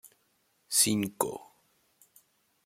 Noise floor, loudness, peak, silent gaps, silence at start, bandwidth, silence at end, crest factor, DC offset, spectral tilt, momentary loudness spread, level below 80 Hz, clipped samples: -72 dBFS; -28 LUFS; -10 dBFS; none; 0.05 s; 16.5 kHz; 1.2 s; 24 dB; under 0.1%; -2.5 dB/octave; 11 LU; -72 dBFS; under 0.1%